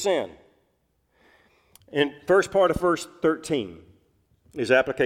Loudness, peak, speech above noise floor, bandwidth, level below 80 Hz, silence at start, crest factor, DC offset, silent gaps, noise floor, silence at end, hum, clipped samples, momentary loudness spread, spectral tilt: -24 LUFS; -6 dBFS; 47 dB; 15.5 kHz; -54 dBFS; 0 s; 20 dB; under 0.1%; none; -70 dBFS; 0 s; none; under 0.1%; 12 LU; -4.5 dB/octave